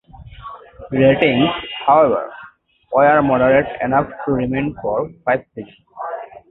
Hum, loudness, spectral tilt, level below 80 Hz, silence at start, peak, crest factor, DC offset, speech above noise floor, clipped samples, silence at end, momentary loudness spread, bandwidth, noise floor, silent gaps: none; -16 LUFS; -10 dB/octave; -46 dBFS; 0.15 s; 0 dBFS; 18 dB; under 0.1%; 29 dB; under 0.1%; 0.15 s; 22 LU; 4.1 kHz; -45 dBFS; none